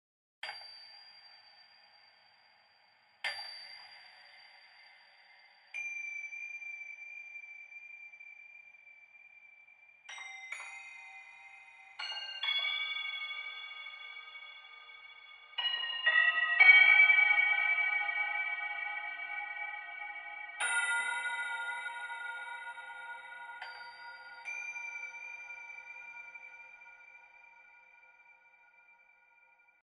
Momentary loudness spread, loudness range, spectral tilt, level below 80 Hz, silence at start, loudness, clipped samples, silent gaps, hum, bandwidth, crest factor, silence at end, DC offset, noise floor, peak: 24 LU; 24 LU; 3.5 dB/octave; under -90 dBFS; 0.45 s; -30 LUFS; under 0.1%; none; none; 11.5 kHz; 26 dB; 2.65 s; under 0.1%; -67 dBFS; -10 dBFS